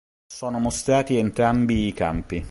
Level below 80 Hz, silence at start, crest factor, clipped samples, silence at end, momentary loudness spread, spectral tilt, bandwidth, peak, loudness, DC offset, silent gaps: -40 dBFS; 0.3 s; 18 dB; under 0.1%; 0 s; 9 LU; -5.5 dB/octave; 11.5 kHz; -6 dBFS; -22 LUFS; under 0.1%; none